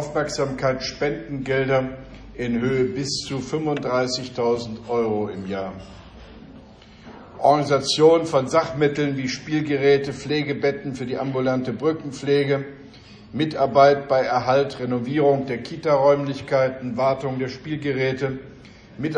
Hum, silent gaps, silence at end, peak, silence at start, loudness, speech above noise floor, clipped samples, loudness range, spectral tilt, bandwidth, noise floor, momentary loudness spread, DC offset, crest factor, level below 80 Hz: none; none; 0 s; -2 dBFS; 0 s; -22 LUFS; 24 dB; under 0.1%; 5 LU; -5.5 dB/octave; 10 kHz; -45 dBFS; 11 LU; under 0.1%; 20 dB; -52 dBFS